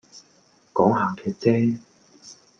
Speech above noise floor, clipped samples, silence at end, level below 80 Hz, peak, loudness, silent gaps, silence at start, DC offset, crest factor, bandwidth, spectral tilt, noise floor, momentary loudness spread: 38 dB; under 0.1%; 0.25 s; -64 dBFS; -4 dBFS; -23 LUFS; none; 0.15 s; under 0.1%; 20 dB; 7.6 kHz; -7.5 dB/octave; -59 dBFS; 8 LU